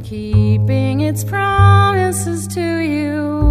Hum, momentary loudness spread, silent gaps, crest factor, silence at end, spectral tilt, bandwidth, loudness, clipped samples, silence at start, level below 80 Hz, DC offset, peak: none; 9 LU; none; 14 dB; 0 s; -6 dB/octave; 15 kHz; -15 LUFS; under 0.1%; 0 s; -30 dBFS; under 0.1%; 0 dBFS